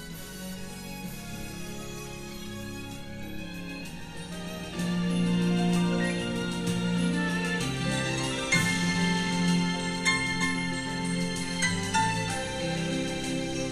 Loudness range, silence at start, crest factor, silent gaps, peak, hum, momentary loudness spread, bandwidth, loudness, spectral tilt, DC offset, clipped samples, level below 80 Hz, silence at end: 12 LU; 0 s; 18 dB; none; -12 dBFS; none; 13 LU; 14 kHz; -29 LUFS; -4.5 dB/octave; under 0.1%; under 0.1%; -48 dBFS; 0 s